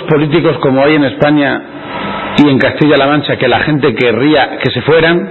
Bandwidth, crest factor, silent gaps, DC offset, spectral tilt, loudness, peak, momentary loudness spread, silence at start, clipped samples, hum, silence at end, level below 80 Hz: 6.4 kHz; 10 dB; none; under 0.1%; -8 dB/octave; -10 LUFS; 0 dBFS; 6 LU; 0 s; under 0.1%; none; 0 s; -40 dBFS